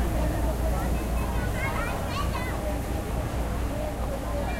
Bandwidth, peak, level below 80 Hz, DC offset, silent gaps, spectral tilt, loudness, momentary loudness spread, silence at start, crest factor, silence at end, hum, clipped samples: 16 kHz; -14 dBFS; -30 dBFS; under 0.1%; none; -6 dB/octave; -29 LUFS; 3 LU; 0 s; 12 dB; 0 s; none; under 0.1%